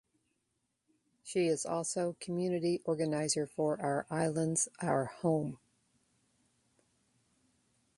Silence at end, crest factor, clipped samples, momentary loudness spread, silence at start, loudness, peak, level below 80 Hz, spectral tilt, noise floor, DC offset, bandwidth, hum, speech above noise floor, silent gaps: 2.4 s; 20 dB; under 0.1%; 4 LU; 1.25 s; -34 LUFS; -16 dBFS; -74 dBFS; -5 dB/octave; -82 dBFS; under 0.1%; 11.5 kHz; none; 49 dB; none